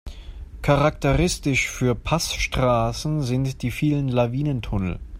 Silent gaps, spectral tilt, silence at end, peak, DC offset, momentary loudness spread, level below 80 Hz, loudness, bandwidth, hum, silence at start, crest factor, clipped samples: none; -5.5 dB/octave; 0 s; -6 dBFS; under 0.1%; 7 LU; -34 dBFS; -22 LUFS; 16 kHz; none; 0.05 s; 18 dB; under 0.1%